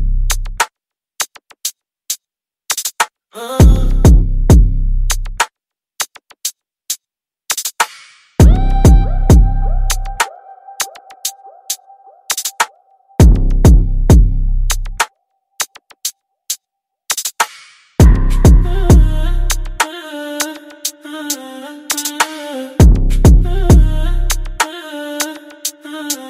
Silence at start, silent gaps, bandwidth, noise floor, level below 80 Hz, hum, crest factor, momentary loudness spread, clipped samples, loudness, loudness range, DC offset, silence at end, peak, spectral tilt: 0 s; none; 16 kHz; -85 dBFS; -14 dBFS; none; 12 dB; 13 LU; under 0.1%; -15 LUFS; 7 LU; under 0.1%; 0 s; 0 dBFS; -4.5 dB/octave